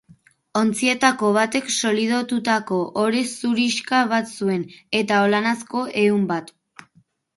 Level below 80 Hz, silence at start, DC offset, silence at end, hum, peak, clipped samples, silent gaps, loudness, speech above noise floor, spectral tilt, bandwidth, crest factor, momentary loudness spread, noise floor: -68 dBFS; 0.55 s; under 0.1%; 0.9 s; none; -2 dBFS; under 0.1%; none; -21 LUFS; 40 dB; -4 dB/octave; 11.5 kHz; 20 dB; 7 LU; -60 dBFS